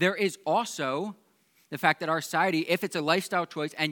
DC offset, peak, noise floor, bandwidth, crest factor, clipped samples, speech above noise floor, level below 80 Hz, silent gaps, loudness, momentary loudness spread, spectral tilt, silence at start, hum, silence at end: under 0.1%; -6 dBFS; -62 dBFS; 19 kHz; 22 dB; under 0.1%; 35 dB; -88 dBFS; none; -28 LUFS; 7 LU; -4 dB/octave; 0 s; none; 0 s